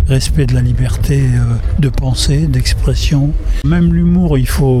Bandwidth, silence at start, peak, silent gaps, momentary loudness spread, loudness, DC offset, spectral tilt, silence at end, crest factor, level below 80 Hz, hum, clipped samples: 14.5 kHz; 0 s; -2 dBFS; none; 4 LU; -13 LUFS; under 0.1%; -6.5 dB/octave; 0 s; 10 dB; -16 dBFS; none; under 0.1%